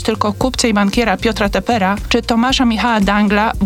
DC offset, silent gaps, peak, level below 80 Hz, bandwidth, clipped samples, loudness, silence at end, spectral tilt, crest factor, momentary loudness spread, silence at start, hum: under 0.1%; none; -2 dBFS; -30 dBFS; 16 kHz; under 0.1%; -14 LUFS; 0 s; -4.5 dB/octave; 12 dB; 4 LU; 0 s; none